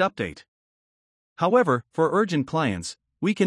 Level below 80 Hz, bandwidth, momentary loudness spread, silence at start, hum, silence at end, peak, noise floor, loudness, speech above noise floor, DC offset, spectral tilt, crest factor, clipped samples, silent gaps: -64 dBFS; 11.5 kHz; 12 LU; 0 s; none; 0 s; -8 dBFS; under -90 dBFS; -24 LUFS; over 67 dB; under 0.1%; -6 dB/octave; 18 dB; under 0.1%; 0.48-1.36 s